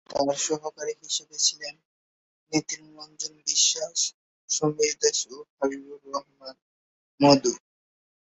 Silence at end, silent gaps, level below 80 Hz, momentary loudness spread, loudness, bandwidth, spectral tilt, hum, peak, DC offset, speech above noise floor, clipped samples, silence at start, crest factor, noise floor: 0.7 s; 1.85-2.47 s, 4.14-4.48 s, 5.50-5.57 s, 6.62-7.18 s; -70 dBFS; 18 LU; -25 LUFS; 8.4 kHz; -2.5 dB/octave; none; -4 dBFS; under 0.1%; over 63 dB; under 0.1%; 0.1 s; 24 dB; under -90 dBFS